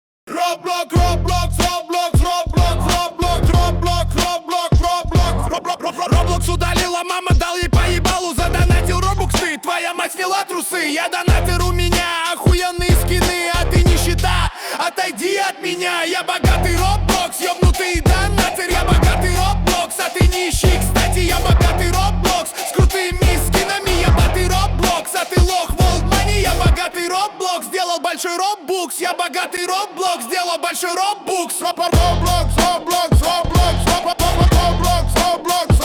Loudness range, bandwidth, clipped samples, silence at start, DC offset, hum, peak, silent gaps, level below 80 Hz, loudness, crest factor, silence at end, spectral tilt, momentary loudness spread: 2 LU; over 20 kHz; under 0.1%; 0.25 s; under 0.1%; none; -4 dBFS; none; -20 dBFS; -17 LUFS; 12 dB; 0 s; -4.5 dB/octave; 5 LU